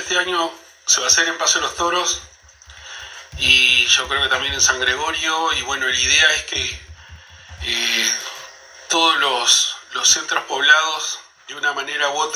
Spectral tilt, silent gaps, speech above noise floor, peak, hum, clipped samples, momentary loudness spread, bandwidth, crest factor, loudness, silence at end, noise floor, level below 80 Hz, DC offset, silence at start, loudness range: 0.5 dB/octave; none; 26 dB; 0 dBFS; none; under 0.1%; 15 LU; 19.5 kHz; 20 dB; -16 LUFS; 0 s; -44 dBFS; -46 dBFS; under 0.1%; 0 s; 3 LU